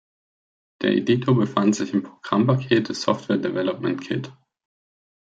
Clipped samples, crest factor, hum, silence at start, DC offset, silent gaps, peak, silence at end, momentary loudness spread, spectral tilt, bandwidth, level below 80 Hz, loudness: under 0.1%; 18 dB; none; 0.8 s; under 0.1%; none; -6 dBFS; 0.95 s; 8 LU; -6.5 dB/octave; 8 kHz; -68 dBFS; -22 LUFS